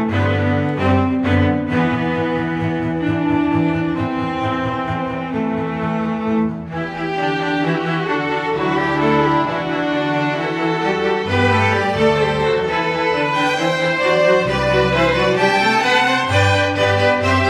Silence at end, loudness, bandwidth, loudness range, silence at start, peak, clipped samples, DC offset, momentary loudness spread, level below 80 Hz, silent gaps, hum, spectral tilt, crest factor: 0 s; -17 LUFS; 12.5 kHz; 5 LU; 0 s; -2 dBFS; under 0.1%; under 0.1%; 6 LU; -42 dBFS; none; none; -6 dB/octave; 14 dB